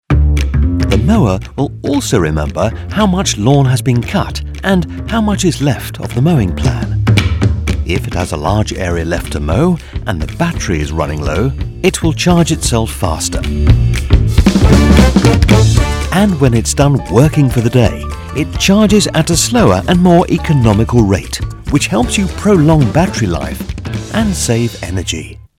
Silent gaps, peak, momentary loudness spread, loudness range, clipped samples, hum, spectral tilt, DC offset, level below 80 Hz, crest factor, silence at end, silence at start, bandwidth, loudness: none; 0 dBFS; 9 LU; 5 LU; 0.3%; none; -5.5 dB/octave; under 0.1%; -20 dBFS; 12 dB; 0.25 s; 0.1 s; 16.5 kHz; -12 LUFS